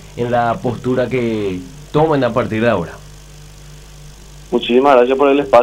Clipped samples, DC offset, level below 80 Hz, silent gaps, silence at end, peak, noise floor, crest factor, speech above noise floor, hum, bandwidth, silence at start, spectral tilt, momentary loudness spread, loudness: under 0.1%; under 0.1%; -40 dBFS; none; 0 s; 0 dBFS; -37 dBFS; 16 dB; 23 dB; none; 16 kHz; 0 s; -6.5 dB/octave; 11 LU; -15 LUFS